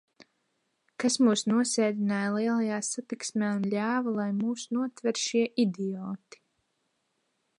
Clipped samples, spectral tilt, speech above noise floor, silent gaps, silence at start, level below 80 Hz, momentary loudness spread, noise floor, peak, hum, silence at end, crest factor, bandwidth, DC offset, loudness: under 0.1%; -4.5 dB/octave; 49 dB; none; 1 s; -80 dBFS; 9 LU; -77 dBFS; -12 dBFS; none; 1.4 s; 16 dB; 11 kHz; under 0.1%; -28 LUFS